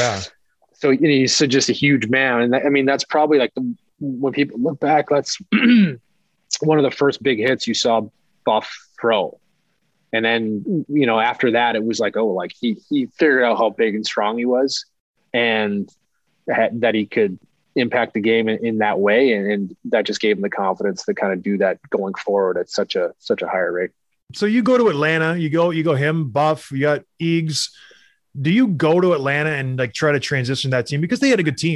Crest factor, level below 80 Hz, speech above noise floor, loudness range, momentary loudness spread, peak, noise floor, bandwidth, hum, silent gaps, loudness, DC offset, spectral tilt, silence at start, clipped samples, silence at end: 14 dB; -60 dBFS; 49 dB; 3 LU; 8 LU; -4 dBFS; -68 dBFS; 12 kHz; none; 15.00-15.14 s; -19 LUFS; under 0.1%; -5 dB/octave; 0 s; under 0.1%; 0 s